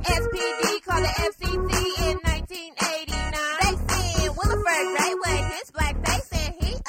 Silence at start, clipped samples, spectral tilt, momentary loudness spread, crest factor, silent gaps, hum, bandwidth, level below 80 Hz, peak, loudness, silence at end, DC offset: 0 s; under 0.1%; -3.5 dB/octave; 5 LU; 16 dB; none; none; 16.5 kHz; -30 dBFS; -8 dBFS; -25 LUFS; 0 s; under 0.1%